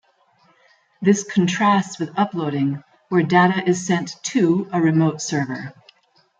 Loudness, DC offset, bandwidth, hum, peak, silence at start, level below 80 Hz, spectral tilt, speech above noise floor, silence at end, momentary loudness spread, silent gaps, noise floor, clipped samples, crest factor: -20 LUFS; under 0.1%; 9.4 kHz; none; -2 dBFS; 1 s; -66 dBFS; -5.5 dB/octave; 40 dB; 0.7 s; 8 LU; none; -59 dBFS; under 0.1%; 18 dB